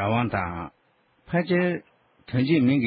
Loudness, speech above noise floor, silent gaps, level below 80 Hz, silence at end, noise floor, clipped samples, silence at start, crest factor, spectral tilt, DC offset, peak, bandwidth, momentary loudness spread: -25 LUFS; 41 dB; none; -50 dBFS; 0 s; -65 dBFS; under 0.1%; 0 s; 14 dB; -11.5 dB/octave; under 0.1%; -10 dBFS; 5 kHz; 13 LU